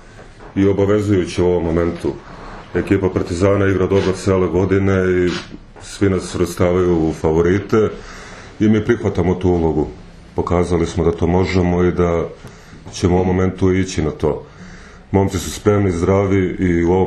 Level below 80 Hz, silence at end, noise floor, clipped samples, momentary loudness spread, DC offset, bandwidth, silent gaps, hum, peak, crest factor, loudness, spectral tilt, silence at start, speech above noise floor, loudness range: -36 dBFS; 0 s; -38 dBFS; under 0.1%; 12 LU; under 0.1%; 12.5 kHz; none; none; 0 dBFS; 16 dB; -17 LUFS; -7 dB/octave; 0.15 s; 22 dB; 2 LU